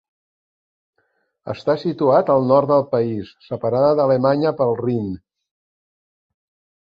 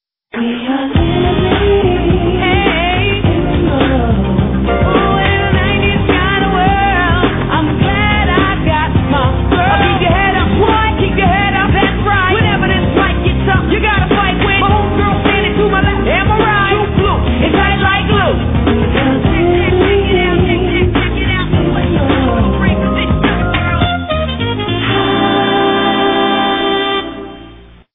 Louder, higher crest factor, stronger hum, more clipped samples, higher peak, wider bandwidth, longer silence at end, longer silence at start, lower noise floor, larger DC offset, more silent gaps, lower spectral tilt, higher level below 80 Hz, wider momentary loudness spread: second, -18 LUFS vs -12 LUFS; first, 18 dB vs 12 dB; neither; neither; about the same, -2 dBFS vs 0 dBFS; first, 5.4 kHz vs 3.9 kHz; first, 1.65 s vs 0.3 s; first, 1.45 s vs 0.35 s; first, -68 dBFS vs -37 dBFS; second, under 0.1% vs 0.2%; neither; first, -9.5 dB/octave vs -4.5 dB/octave; second, -58 dBFS vs -20 dBFS; first, 14 LU vs 3 LU